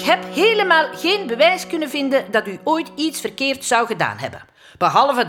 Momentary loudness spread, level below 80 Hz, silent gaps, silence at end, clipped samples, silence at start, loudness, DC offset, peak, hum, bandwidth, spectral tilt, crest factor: 8 LU; -64 dBFS; none; 0 s; under 0.1%; 0 s; -18 LUFS; under 0.1%; -2 dBFS; none; 18.5 kHz; -3 dB/octave; 18 dB